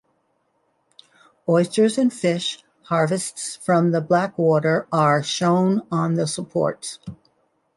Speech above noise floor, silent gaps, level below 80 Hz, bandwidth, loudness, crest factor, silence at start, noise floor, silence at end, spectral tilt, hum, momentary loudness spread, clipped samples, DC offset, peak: 48 dB; none; -64 dBFS; 11.5 kHz; -21 LUFS; 16 dB; 1.45 s; -68 dBFS; 0.6 s; -5.5 dB/octave; none; 10 LU; under 0.1%; under 0.1%; -6 dBFS